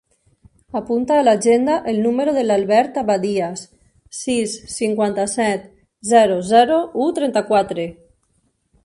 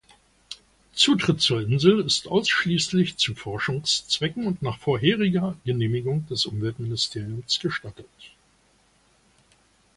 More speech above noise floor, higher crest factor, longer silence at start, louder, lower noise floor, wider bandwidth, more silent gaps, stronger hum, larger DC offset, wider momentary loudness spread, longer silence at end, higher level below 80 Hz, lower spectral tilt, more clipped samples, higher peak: first, 48 dB vs 38 dB; about the same, 18 dB vs 22 dB; first, 0.75 s vs 0.5 s; first, -18 LUFS vs -23 LUFS; about the same, -65 dBFS vs -62 dBFS; about the same, 11.5 kHz vs 11.5 kHz; neither; neither; neither; about the same, 13 LU vs 12 LU; second, 0.9 s vs 1.7 s; about the same, -56 dBFS vs -56 dBFS; about the same, -4.5 dB/octave vs -4.5 dB/octave; neither; about the same, -2 dBFS vs -4 dBFS